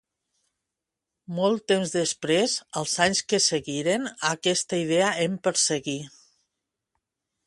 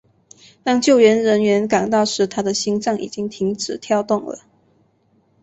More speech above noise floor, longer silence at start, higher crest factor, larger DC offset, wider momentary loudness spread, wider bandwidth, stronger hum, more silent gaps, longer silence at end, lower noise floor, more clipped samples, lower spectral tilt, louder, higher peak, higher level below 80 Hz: first, 61 dB vs 43 dB; first, 1.3 s vs 0.65 s; first, 22 dB vs 16 dB; neither; second, 6 LU vs 13 LU; first, 11.5 kHz vs 8.2 kHz; neither; neither; first, 1.4 s vs 1.05 s; first, -86 dBFS vs -60 dBFS; neither; second, -3 dB/octave vs -4.5 dB/octave; second, -24 LUFS vs -18 LUFS; second, -6 dBFS vs -2 dBFS; second, -68 dBFS vs -60 dBFS